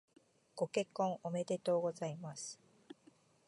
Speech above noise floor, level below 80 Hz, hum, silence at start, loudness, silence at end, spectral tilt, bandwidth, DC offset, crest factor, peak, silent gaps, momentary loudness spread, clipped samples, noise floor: 30 dB; -88 dBFS; none; 0.55 s; -39 LUFS; 0.55 s; -5 dB/octave; 11.5 kHz; under 0.1%; 18 dB; -22 dBFS; none; 23 LU; under 0.1%; -68 dBFS